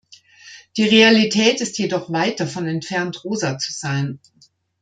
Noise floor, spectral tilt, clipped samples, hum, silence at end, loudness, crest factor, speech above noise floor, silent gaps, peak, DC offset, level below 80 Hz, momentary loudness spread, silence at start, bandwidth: -46 dBFS; -4 dB/octave; under 0.1%; none; 0.65 s; -18 LUFS; 20 dB; 27 dB; none; 0 dBFS; under 0.1%; -64 dBFS; 13 LU; 0.1 s; 9.4 kHz